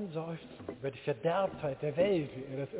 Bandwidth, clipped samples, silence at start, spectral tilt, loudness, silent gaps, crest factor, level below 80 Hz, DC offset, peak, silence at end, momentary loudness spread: 4 kHz; under 0.1%; 0 s; -6 dB/octave; -35 LUFS; none; 18 dB; -64 dBFS; under 0.1%; -18 dBFS; 0 s; 12 LU